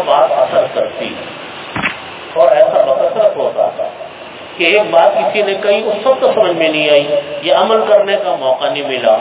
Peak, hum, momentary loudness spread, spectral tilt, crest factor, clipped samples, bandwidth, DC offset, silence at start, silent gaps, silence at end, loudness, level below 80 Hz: 0 dBFS; none; 13 LU; -8 dB/octave; 12 dB; 0.1%; 4 kHz; under 0.1%; 0 s; none; 0 s; -12 LUFS; -54 dBFS